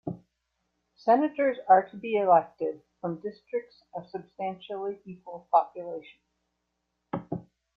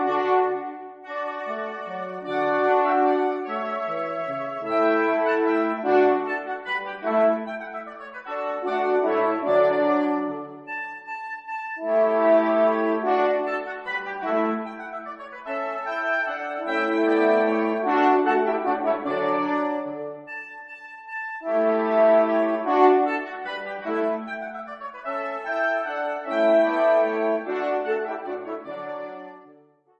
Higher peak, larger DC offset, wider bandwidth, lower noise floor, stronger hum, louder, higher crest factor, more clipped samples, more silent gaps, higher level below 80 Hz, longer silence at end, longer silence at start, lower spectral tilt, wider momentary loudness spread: second, -8 dBFS vs -4 dBFS; neither; second, 5.4 kHz vs 7.4 kHz; first, -80 dBFS vs -55 dBFS; neither; second, -28 LUFS vs -23 LUFS; about the same, 22 dB vs 20 dB; neither; neither; about the same, -72 dBFS vs -74 dBFS; second, 0.35 s vs 0.5 s; about the same, 0.05 s vs 0 s; first, -9 dB/octave vs -6.5 dB/octave; first, 19 LU vs 15 LU